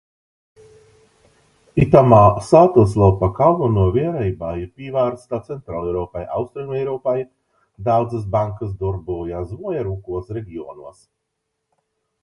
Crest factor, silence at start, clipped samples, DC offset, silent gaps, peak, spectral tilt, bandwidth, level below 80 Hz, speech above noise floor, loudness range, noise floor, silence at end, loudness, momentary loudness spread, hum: 18 dB; 1.75 s; under 0.1%; under 0.1%; none; 0 dBFS; -9 dB/octave; 11.5 kHz; -40 dBFS; 58 dB; 12 LU; -76 dBFS; 1.3 s; -18 LUFS; 16 LU; none